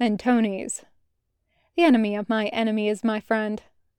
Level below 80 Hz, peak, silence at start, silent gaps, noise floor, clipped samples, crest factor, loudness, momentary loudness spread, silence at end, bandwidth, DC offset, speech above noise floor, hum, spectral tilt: -64 dBFS; -8 dBFS; 0 s; none; -73 dBFS; under 0.1%; 16 dB; -23 LUFS; 13 LU; 0.4 s; 11.5 kHz; under 0.1%; 51 dB; none; -5 dB/octave